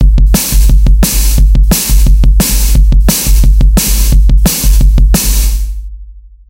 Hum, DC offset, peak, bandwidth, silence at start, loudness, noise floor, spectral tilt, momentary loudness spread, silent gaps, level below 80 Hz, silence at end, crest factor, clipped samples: none; under 0.1%; 0 dBFS; 17 kHz; 0 s; -9 LUFS; -31 dBFS; -4 dB/octave; 3 LU; none; -6 dBFS; 0.3 s; 6 dB; 0.5%